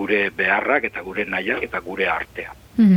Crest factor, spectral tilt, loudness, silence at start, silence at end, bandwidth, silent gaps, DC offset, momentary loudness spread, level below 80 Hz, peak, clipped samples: 16 dB; -7.5 dB/octave; -21 LUFS; 0 s; 0 s; 12.5 kHz; none; under 0.1%; 9 LU; -50 dBFS; -4 dBFS; under 0.1%